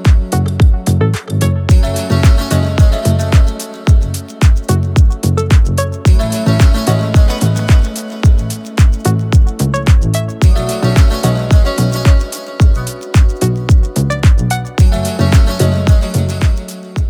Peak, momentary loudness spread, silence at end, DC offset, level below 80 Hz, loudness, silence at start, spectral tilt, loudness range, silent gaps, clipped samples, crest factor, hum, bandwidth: 0 dBFS; 5 LU; 0 s; under 0.1%; -14 dBFS; -13 LUFS; 0 s; -6 dB/octave; 1 LU; none; under 0.1%; 10 dB; none; 16 kHz